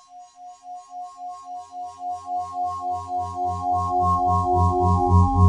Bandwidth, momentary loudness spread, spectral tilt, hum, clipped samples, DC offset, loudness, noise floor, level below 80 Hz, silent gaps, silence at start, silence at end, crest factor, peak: 9.4 kHz; 20 LU; -9 dB/octave; none; under 0.1%; under 0.1%; -23 LUFS; -44 dBFS; -42 dBFS; none; 0.1 s; 0 s; 18 dB; -4 dBFS